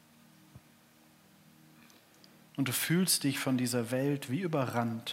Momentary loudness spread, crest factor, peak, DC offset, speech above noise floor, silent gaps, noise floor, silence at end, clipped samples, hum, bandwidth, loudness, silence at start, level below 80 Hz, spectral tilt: 7 LU; 20 dB; -16 dBFS; under 0.1%; 31 dB; none; -62 dBFS; 0 s; under 0.1%; none; 16 kHz; -31 LUFS; 0.55 s; -82 dBFS; -4 dB/octave